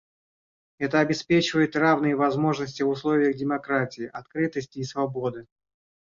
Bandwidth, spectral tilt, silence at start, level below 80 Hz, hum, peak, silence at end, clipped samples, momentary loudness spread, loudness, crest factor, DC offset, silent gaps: 7.6 kHz; -6 dB/octave; 0.8 s; -62 dBFS; none; -6 dBFS; 0.7 s; under 0.1%; 11 LU; -25 LUFS; 18 dB; under 0.1%; none